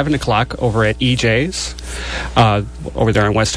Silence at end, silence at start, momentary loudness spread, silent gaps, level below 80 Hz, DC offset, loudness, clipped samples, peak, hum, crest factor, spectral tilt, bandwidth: 0 s; 0 s; 10 LU; none; -30 dBFS; under 0.1%; -16 LUFS; under 0.1%; 0 dBFS; none; 16 dB; -5 dB/octave; 11 kHz